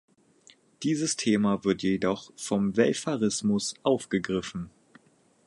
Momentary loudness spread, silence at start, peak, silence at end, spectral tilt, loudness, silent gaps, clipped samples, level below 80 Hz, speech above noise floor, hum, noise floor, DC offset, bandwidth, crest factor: 9 LU; 0.8 s; -8 dBFS; 0.8 s; -4.5 dB/octave; -27 LUFS; none; under 0.1%; -60 dBFS; 35 dB; none; -62 dBFS; under 0.1%; 11.5 kHz; 20 dB